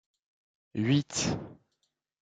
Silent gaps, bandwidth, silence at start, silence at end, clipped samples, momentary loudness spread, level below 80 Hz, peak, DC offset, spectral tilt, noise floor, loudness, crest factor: none; 9.4 kHz; 0.75 s; 0.7 s; under 0.1%; 14 LU; -60 dBFS; -14 dBFS; under 0.1%; -4.5 dB/octave; -80 dBFS; -30 LUFS; 18 dB